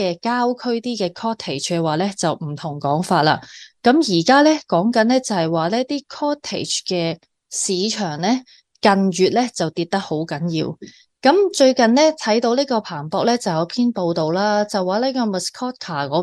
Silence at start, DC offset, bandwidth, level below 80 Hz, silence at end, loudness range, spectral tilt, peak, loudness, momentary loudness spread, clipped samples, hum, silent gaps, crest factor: 0 s; under 0.1%; 12.5 kHz; -64 dBFS; 0 s; 4 LU; -4.5 dB/octave; -2 dBFS; -19 LUFS; 10 LU; under 0.1%; none; none; 18 dB